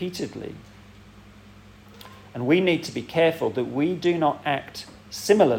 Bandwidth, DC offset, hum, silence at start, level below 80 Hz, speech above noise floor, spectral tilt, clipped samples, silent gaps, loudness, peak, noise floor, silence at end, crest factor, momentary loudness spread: 17 kHz; under 0.1%; none; 0 s; -58 dBFS; 25 dB; -5.5 dB/octave; under 0.1%; none; -24 LUFS; -4 dBFS; -48 dBFS; 0 s; 20 dB; 19 LU